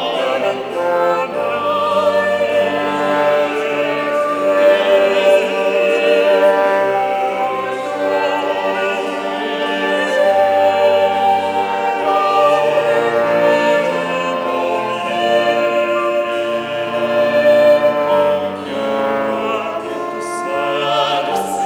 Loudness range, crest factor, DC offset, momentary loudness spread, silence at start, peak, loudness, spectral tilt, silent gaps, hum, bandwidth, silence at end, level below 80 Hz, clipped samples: 4 LU; 14 dB; under 0.1%; 7 LU; 0 s; -2 dBFS; -15 LUFS; -4 dB/octave; none; none; over 20 kHz; 0 s; -60 dBFS; under 0.1%